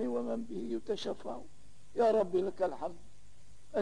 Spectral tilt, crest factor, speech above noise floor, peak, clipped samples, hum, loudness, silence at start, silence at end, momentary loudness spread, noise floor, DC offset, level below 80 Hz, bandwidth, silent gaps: -6 dB/octave; 16 dB; 27 dB; -20 dBFS; under 0.1%; 50 Hz at -65 dBFS; -35 LUFS; 0 s; 0 s; 14 LU; -61 dBFS; 0.7%; -64 dBFS; 10.5 kHz; none